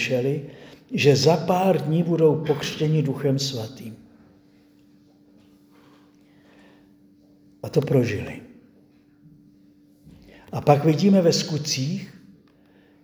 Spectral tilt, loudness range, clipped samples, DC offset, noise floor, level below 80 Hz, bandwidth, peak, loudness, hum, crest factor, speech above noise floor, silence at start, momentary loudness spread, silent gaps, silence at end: -6 dB/octave; 9 LU; under 0.1%; under 0.1%; -56 dBFS; -62 dBFS; over 20 kHz; 0 dBFS; -22 LUFS; none; 24 dB; 35 dB; 0 s; 18 LU; none; 0.95 s